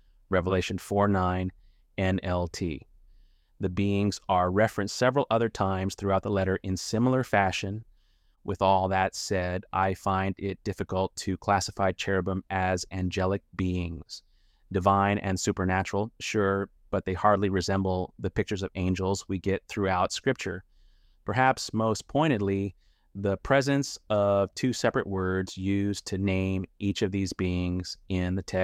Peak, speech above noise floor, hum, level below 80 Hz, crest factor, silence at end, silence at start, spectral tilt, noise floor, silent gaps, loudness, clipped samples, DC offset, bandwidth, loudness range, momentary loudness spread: -8 dBFS; 36 dB; none; -52 dBFS; 20 dB; 0 s; 0.3 s; -5.5 dB/octave; -64 dBFS; none; -28 LUFS; under 0.1%; under 0.1%; 14.5 kHz; 3 LU; 8 LU